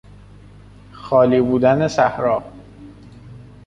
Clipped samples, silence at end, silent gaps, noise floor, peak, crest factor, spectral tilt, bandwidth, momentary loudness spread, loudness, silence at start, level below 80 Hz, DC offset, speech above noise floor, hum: under 0.1%; 0.25 s; none; -43 dBFS; -2 dBFS; 18 dB; -7 dB/octave; 10.5 kHz; 8 LU; -17 LUFS; 0.95 s; -48 dBFS; under 0.1%; 27 dB; 50 Hz at -40 dBFS